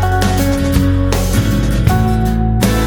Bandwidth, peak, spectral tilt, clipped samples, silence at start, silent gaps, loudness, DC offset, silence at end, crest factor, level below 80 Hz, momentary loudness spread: 20 kHz; 0 dBFS; -6 dB/octave; under 0.1%; 0 s; none; -14 LUFS; under 0.1%; 0 s; 12 dB; -18 dBFS; 2 LU